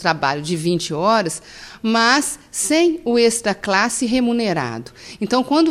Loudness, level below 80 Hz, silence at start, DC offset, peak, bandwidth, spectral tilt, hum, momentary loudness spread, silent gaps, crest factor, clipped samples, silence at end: -18 LUFS; -52 dBFS; 0 s; under 0.1%; -2 dBFS; 15 kHz; -3.5 dB/octave; none; 11 LU; none; 16 dB; under 0.1%; 0 s